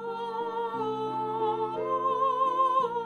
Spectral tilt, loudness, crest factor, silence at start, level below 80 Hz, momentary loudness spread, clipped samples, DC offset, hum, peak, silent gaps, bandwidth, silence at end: -6.5 dB/octave; -29 LUFS; 14 dB; 0 s; -72 dBFS; 7 LU; under 0.1%; under 0.1%; none; -16 dBFS; none; 9.8 kHz; 0 s